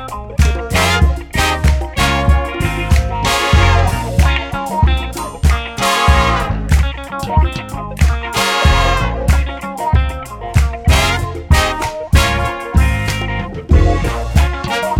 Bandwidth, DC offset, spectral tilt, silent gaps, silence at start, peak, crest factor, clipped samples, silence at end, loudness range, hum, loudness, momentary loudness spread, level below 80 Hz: 16.5 kHz; under 0.1%; -5 dB/octave; none; 0 s; 0 dBFS; 14 dB; under 0.1%; 0 s; 2 LU; none; -15 LUFS; 8 LU; -18 dBFS